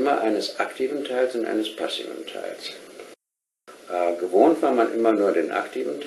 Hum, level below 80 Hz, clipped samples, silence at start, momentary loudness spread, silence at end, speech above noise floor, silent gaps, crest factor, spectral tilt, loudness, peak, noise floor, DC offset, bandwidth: none; -74 dBFS; under 0.1%; 0 s; 15 LU; 0 s; 63 dB; none; 20 dB; -4 dB/octave; -23 LUFS; -4 dBFS; -86 dBFS; under 0.1%; 12.5 kHz